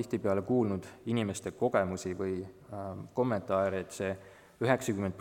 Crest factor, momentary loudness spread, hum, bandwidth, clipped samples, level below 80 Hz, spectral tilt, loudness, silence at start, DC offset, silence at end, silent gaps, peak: 20 dB; 10 LU; none; 17 kHz; under 0.1%; -66 dBFS; -6 dB/octave; -33 LUFS; 0 s; under 0.1%; 0 s; none; -12 dBFS